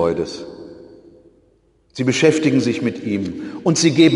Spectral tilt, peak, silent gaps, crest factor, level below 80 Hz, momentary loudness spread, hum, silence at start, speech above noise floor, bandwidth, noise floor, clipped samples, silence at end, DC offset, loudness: -5 dB/octave; 0 dBFS; none; 18 dB; -54 dBFS; 21 LU; none; 0 s; 41 dB; 11 kHz; -57 dBFS; under 0.1%; 0 s; under 0.1%; -18 LUFS